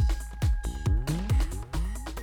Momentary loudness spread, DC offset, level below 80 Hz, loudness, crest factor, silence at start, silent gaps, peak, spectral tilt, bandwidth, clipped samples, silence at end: 6 LU; under 0.1%; -28 dBFS; -30 LUFS; 10 dB; 0 s; none; -18 dBFS; -6 dB/octave; 16 kHz; under 0.1%; 0 s